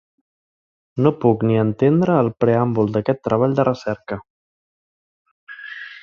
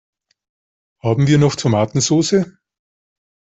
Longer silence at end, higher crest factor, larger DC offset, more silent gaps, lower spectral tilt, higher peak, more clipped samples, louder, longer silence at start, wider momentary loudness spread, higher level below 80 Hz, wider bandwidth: second, 0.05 s vs 0.95 s; about the same, 18 dB vs 16 dB; neither; first, 4.30-5.25 s, 5.31-5.47 s vs none; first, -9.5 dB/octave vs -5.5 dB/octave; about the same, -2 dBFS vs -4 dBFS; neither; about the same, -18 LUFS vs -16 LUFS; about the same, 0.95 s vs 1.05 s; first, 16 LU vs 8 LU; about the same, -54 dBFS vs -52 dBFS; second, 7 kHz vs 8.2 kHz